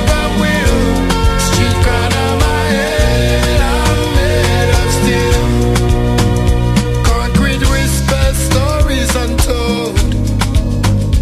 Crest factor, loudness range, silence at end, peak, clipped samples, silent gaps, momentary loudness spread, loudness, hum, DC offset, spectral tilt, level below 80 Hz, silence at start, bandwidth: 12 dB; 1 LU; 0 s; 0 dBFS; under 0.1%; none; 2 LU; -13 LUFS; none; under 0.1%; -5 dB/octave; -16 dBFS; 0 s; 15 kHz